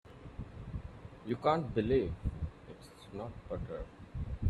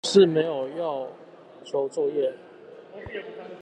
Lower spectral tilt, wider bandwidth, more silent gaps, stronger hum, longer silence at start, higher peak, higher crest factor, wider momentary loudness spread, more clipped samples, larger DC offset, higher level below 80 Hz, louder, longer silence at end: first, -8.5 dB/octave vs -5 dB/octave; first, 12 kHz vs 9.6 kHz; neither; neither; about the same, 0.05 s vs 0.05 s; second, -16 dBFS vs -6 dBFS; about the same, 20 dB vs 20 dB; second, 19 LU vs 26 LU; neither; neither; first, -48 dBFS vs -64 dBFS; second, -37 LUFS vs -26 LUFS; about the same, 0 s vs 0 s